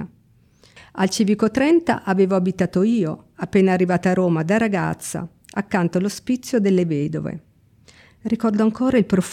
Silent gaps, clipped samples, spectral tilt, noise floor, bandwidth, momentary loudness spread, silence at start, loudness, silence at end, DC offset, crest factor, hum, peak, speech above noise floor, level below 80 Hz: none; under 0.1%; -6.5 dB/octave; -56 dBFS; 14.5 kHz; 12 LU; 0 s; -20 LUFS; 0 s; under 0.1%; 14 dB; none; -6 dBFS; 36 dB; -54 dBFS